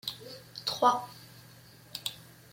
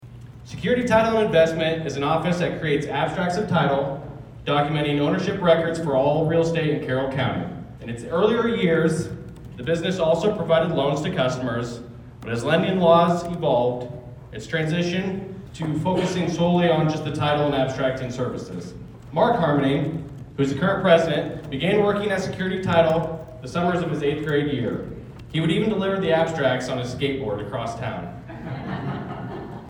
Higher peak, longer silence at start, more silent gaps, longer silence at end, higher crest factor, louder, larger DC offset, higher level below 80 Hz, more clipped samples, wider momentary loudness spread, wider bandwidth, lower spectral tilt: second, -10 dBFS vs -2 dBFS; about the same, 0.05 s vs 0 s; neither; first, 0.3 s vs 0 s; about the same, 24 dB vs 20 dB; second, -31 LUFS vs -22 LUFS; neither; second, -72 dBFS vs -48 dBFS; neither; first, 25 LU vs 15 LU; first, 16.5 kHz vs 11.5 kHz; second, -2.5 dB/octave vs -6.5 dB/octave